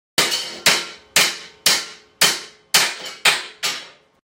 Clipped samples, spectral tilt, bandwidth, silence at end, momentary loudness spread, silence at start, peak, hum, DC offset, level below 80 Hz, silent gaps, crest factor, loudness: under 0.1%; 0.5 dB/octave; 16.5 kHz; 0.4 s; 8 LU; 0.2 s; 0 dBFS; none; under 0.1%; -66 dBFS; none; 20 dB; -18 LUFS